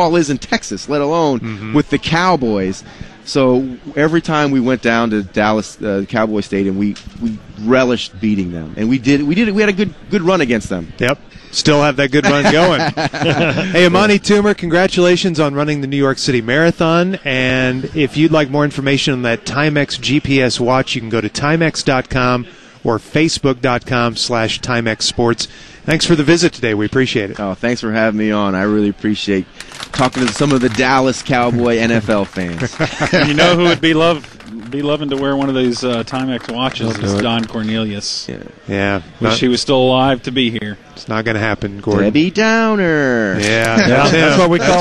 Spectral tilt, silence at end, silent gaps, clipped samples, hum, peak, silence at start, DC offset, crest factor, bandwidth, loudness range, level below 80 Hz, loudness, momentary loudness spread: -5 dB/octave; 0 s; none; under 0.1%; none; 0 dBFS; 0 s; 0.5%; 14 dB; 12.5 kHz; 4 LU; -42 dBFS; -14 LUFS; 9 LU